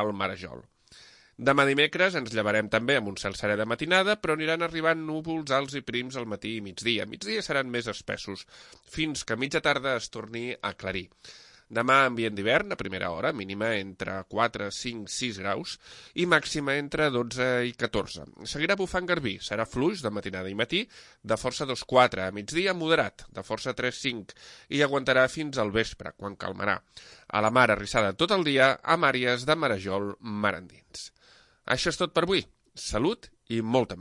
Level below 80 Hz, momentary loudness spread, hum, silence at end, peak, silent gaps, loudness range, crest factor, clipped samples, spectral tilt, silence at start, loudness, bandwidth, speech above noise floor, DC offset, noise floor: -54 dBFS; 14 LU; none; 0 s; -6 dBFS; none; 6 LU; 22 dB; under 0.1%; -4 dB/octave; 0 s; -27 LUFS; 11.5 kHz; 31 dB; under 0.1%; -59 dBFS